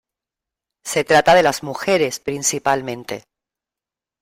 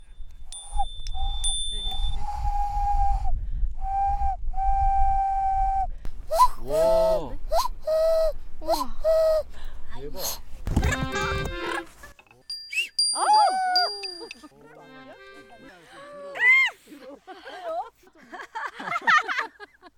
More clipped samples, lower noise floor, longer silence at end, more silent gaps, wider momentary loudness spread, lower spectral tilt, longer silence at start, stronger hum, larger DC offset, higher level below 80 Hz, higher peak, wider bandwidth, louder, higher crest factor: neither; first, -89 dBFS vs -49 dBFS; first, 1 s vs 0.1 s; neither; second, 17 LU vs 21 LU; about the same, -3 dB/octave vs -3 dB/octave; first, 0.85 s vs 0 s; neither; neither; second, -56 dBFS vs -32 dBFS; first, -2 dBFS vs -6 dBFS; about the same, 16 kHz vs 16 kHz; first, -17 LUFS vs -25 LUFS; about the same, 18 dB vs 18 dB